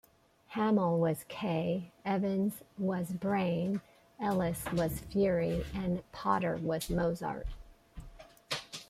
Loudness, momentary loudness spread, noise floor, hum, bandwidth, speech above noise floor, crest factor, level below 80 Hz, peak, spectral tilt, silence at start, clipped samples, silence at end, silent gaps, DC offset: -33 LUFS; 9 LU; -61 dBFS; none; 16 kHz; 28 dB; 18 dB; -52 dBFS; -16 dBFS; -6.5 dB/octave; 0.5 s; under 0.1%; 0.05 s; none; under 0.1%